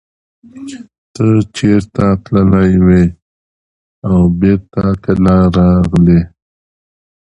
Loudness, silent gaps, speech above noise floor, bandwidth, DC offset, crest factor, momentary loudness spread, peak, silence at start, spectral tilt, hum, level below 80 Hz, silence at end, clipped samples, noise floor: -11 LUFS; 0.98-1.14 s, 3.22-4.02 s; over 80 dB; 8.4 kHz; under 0.1%; 12 dB; 14 LU; 0 dBFS; 0.55 s; -8.5 dB/octave; none; -28 dBFS; 1.1 s; under 0.1%; under -90 dBFS